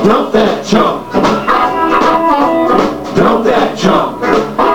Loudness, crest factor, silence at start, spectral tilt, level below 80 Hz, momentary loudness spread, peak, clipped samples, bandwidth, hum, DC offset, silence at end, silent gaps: -11 LUFS; 10 dB; 0 s; -5.5 dB/octave; -40 dBFS; 3 LU; 0 dBFS; under 0.1%; 18 kHz; none; 2%; 0 s; none